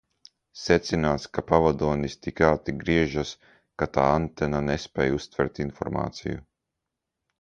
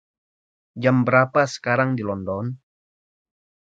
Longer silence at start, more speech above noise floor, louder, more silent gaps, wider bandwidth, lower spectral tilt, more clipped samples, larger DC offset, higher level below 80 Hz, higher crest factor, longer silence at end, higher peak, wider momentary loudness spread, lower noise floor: second, 0.55 s vs 0.75 s; second, 59 dB vs over 70 dB; second, -26 LUFS vs -21 LUFS; neither; first, 9.2 kHz vs 7.8 kHz; about the same, -6 dB/octave vs -7 dB/octave; neither; neither; first, -44 dBFS vs -56 dBFS; about the same, 22 dB vs 22 dB; about the same, 1 s vs 1.05 s; about the same, -4 dBFS vs -2 dBFS; about the same, 12 LU vs 12 LU; second, -84 dBFS vs under -90 dBFS